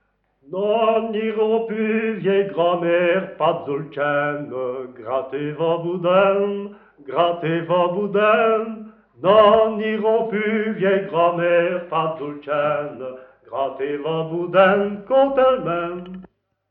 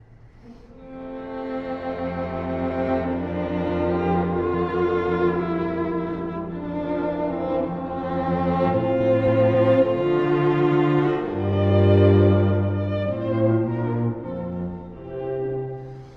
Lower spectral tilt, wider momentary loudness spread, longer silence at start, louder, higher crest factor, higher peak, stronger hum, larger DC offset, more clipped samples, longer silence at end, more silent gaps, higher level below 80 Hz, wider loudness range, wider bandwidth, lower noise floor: about the same, -9.5 dB/octave vs -10 dB/octave; about the same, 12 LU vs 12 LU; first, 0.5 s vs 0.25 s; about the same, -20 LUFS vs -22 LUFS; about the same, 18 dB vs 16 dB; first, 0 dBFS vs -6 dBFS; first, 50 Hz at -60 dBFS vs none; neither; neither; first, 0.45 s vs 0 s; neither; second, -60 dBFS vs -48 dBFS; second, 4 LU vs 7 LU; second, 4.2 kHz vs 5.6 kHz; about the same, -49 dBFS vs -47 dBFS